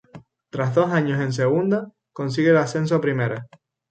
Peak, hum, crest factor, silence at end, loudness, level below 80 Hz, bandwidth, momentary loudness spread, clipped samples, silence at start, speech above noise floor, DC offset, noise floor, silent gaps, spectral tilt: -6 dBFS; none; 16 dB; 0.45 s; -21 LUFS; -64 dBFS; 9 kHz; 12 LU; under 0.1%; 0.15 s; 26 dB; under 0.1%; -47 dBFS; none; -7 dB/octave